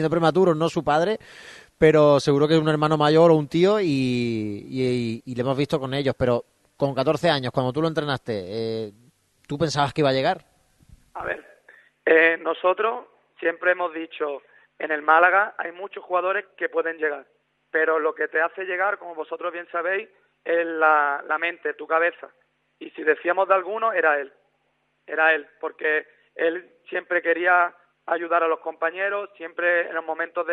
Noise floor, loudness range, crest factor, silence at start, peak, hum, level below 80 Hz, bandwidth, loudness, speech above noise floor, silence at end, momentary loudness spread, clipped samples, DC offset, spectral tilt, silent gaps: -70 dBFS; 6 LU; 20 dB; 0 s; -2 dBFS; none; -58 dBFS; 11.5 kHz; -22 LUFS; 48 dB; 0 s; 13 LU; under 0.1%; under 0.1%; -6 dB/octave; none